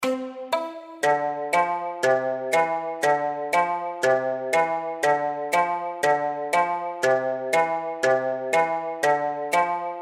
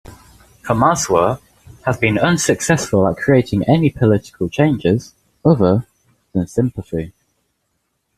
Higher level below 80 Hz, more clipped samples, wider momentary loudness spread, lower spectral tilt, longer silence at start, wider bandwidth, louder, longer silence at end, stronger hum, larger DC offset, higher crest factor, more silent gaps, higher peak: second, -72 dBFS vs -44 dBFS; neither; second, 4 LU vs 11 LU; second, -3.5 dB/octave vs -6 dB/octave; about the same, 0 s vs 0.1 s; first, 16 kHz vs 14.5 kHz; second, -24 LUFS vs -17 LUFS; second, 0 s vs 1.1 s; neither; neither; about the same, 16 dB vs 16 dB; neither; second, -8 dBFS vs -2 dBFS